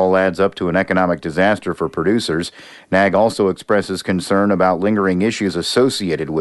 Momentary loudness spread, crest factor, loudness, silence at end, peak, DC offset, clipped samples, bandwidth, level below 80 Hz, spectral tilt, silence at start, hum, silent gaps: 6 LU; 14 dB; -17 LUFS; 0 s; -2 dBFS; under 0.1%; under 0.1%; 12 kHz; -50 dBFS; -5.5 dB/octave; 0 s; none; none